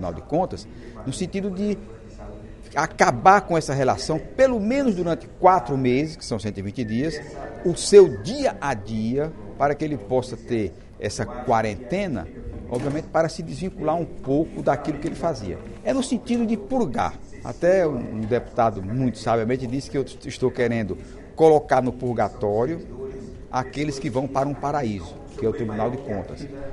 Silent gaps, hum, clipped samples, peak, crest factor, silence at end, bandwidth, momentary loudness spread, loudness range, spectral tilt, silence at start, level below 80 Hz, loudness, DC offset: none; none; under 0.1%; 0 dBFS; 22 dB; 0 s; 11.5 kHz; 14 LU; 6 LU; -6 dB/octave; 0 s; -44 dBFS; -23 LUFS; under 0.1%